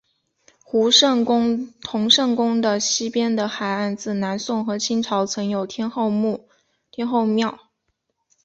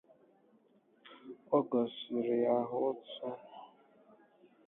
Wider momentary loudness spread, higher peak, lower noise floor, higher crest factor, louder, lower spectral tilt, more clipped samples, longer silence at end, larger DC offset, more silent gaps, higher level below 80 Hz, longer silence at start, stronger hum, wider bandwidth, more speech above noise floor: second, 10 LU vs 22 LU; first, -2 dBFS vs -18 dBFS; first, -74 dBFS vs -68 dBFS; about the same, 20 dB vs 20 dB; first, -20 LUFS vs -34 LUFS; second, -3.5 dB/octave vs -5 dB/octave; neither; about the same, 0.9 s vs 1 s; neither; neither; first, -64 dBFS vs -84 dBFS; second, 0.75 s vs 1.05 s; neither; first, 8 kHz vs 4 kHz; first, 53 dB vs 34 dB